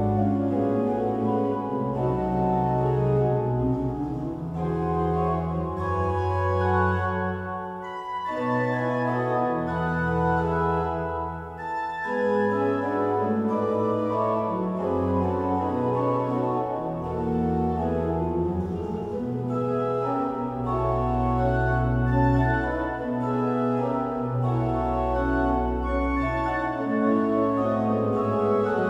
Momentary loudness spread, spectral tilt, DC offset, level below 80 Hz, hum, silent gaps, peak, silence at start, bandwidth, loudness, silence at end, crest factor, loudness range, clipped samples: 6 LU; -9.5 dB/octave; under 0.1%; -38 dBFS; none; none; -10 dBFS; 0 s; 8 kHz; -25 LUFS; 0 s; 16 dB; 2 LU; under 0.1%